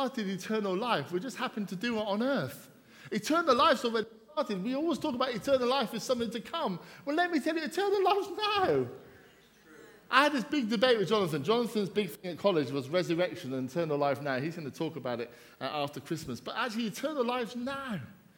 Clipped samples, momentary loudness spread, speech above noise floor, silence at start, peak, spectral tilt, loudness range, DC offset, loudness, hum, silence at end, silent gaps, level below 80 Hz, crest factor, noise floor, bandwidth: under 0.1%; 11 LU; 28 dB; 0 s; -8 dBFS; -5 dB/octave; 5 LU; under 0.1%; -31 LUFS; none; 0.25 s; none; -70 dBFS; 22 dB; -59 dBFS; 18 kHz